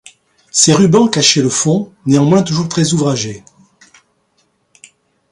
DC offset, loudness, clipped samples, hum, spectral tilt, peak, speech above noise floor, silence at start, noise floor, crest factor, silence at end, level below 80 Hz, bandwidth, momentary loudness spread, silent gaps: under 0.1%; -12 LUFS; under 0.1%; none; -4.5 dB/octave; 0 dBFS; 49 dB; 0.55 s; -61 dBFS; 14 dB; 1.9 s; -52 dBFS; 11.5 kHz; 9 LU; none